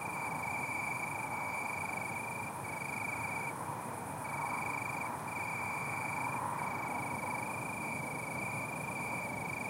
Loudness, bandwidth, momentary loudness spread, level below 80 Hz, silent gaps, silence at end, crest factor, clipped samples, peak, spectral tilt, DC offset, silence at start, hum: -38 LUFS; 16 kHz; 3 LU; -68 dBFS; none; 0 s; 14 dB; under 0.1%; -24 dBFS; -4.5 dB/octave; under 0.1%; 0 s; none